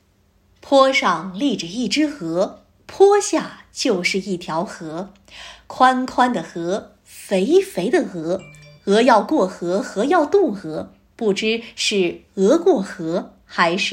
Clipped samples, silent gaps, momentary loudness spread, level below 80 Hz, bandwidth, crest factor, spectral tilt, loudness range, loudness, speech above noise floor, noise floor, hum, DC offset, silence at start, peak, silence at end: under 0.1%; none; 16 LU; -58 dBFS; 16 kHz; 18 dB; -4.5 dB/octave; 3 LU; -19 LUFS; 40 dB; -59 dBFS; none; under 0.1%; 0.65 s; 0 dBFS; 0 s